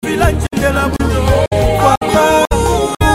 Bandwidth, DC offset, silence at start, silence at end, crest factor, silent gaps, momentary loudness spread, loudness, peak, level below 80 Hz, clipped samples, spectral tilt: 16.5 kHz; under 0.1%; 0.05 s; 0 s; 12 dB; 1.97-2.01 s; 4 LU; -13 LUFS; 0 dBFS; -20 dBFS; under 0.1%; -5.5 dB/octave